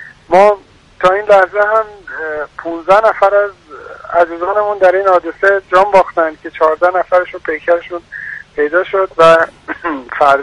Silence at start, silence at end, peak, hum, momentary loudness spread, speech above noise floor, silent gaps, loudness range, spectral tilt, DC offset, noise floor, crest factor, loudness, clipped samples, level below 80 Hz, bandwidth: 0 s; 0 s; 0 dBFS; none; 13 LU; 19 dB; none; 2 LU; -5 dB/octave; under 0.1%; -31 dBFS; 12 dB; -12 LUFS; 0.1%; -48 dBFS; 11 kHz